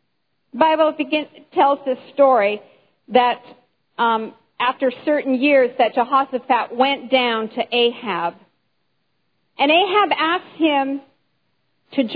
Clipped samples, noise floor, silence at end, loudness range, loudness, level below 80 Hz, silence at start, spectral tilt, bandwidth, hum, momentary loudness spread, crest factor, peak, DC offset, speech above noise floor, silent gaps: under 0.1%; -72 dBFS; 0 s; 2 LU; -18 LUFS; -82 dBFS; 0.55 s; -7 dB/octave; 5 kHz; none; 10 LU; 18 dB; -2 dBFS; under 0.1%; 54 dB; none